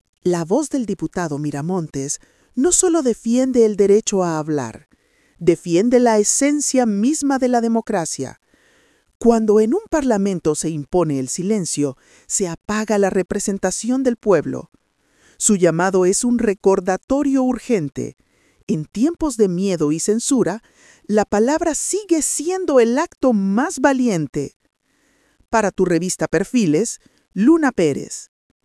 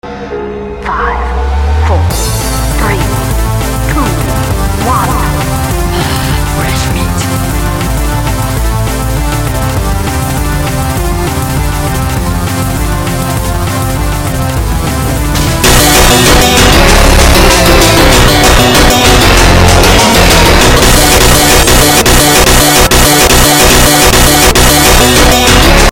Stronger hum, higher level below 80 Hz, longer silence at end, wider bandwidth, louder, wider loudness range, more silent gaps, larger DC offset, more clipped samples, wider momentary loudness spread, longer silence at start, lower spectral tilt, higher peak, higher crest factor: neither; second, -48 dBFS vs -12 dBFS; first, 0.4 s vs 0 s; second, 12 kHz vs over 20 kHz; second, -18 LUFS vs -7 LUFS; second, 3 LU vs 9 LU; first, 9.15-9.20 s, 17.03-17.08 s, 18.63-18.67 s, 24.56-24.60 s vs none; neither; second, under 0.1% vs 2%; about the same, 10 LU vs 9 LU; first, 0.25 s vs 0.05 s; first, -5 dB/octave vs -3.5 dB/octave; about the same, 0 dBFS vs 0 dBFS; first, 18 dB vs 8 dB